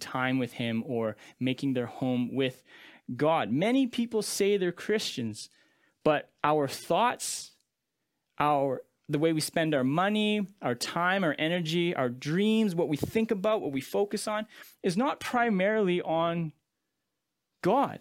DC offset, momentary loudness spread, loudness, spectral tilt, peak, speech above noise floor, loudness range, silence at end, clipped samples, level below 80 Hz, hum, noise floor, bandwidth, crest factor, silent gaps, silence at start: under 0.1%; 8 LU; -29 LUFS; -5 dB/octave; -8 dBFS; 56 dB; 2 LU; 0.05 s; under 0.1%; -68 dBFS; none; -84 dBFS; 16.5 kHz; 22 dB; none; 0 s